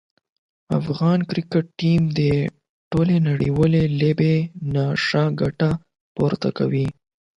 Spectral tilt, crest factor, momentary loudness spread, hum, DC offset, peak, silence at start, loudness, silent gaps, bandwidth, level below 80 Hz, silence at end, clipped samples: -8 dB/octave; 16 dB; 7 LU; none; under 0.1%; -6 dBFS; 0.7 s; -21 LUFS; 2.69-2.91 s, 6.01-6.15 s; 7.6 kHz; -48 dBFS; 0.45 s; under 0.1%